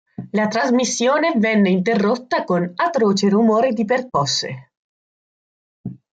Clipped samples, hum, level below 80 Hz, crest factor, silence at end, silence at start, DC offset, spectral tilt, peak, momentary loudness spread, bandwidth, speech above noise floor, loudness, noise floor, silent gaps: under 0.1%; none; -64 dBFS; 14 dB; 0.15 s; 0.2 s; under 0.1%; -5 dB/octave; -6 dBFS; 10 LU; 9 kHz; over 73 dB; -18 LUFS; under -90 dBFS; 4.77-5.84 s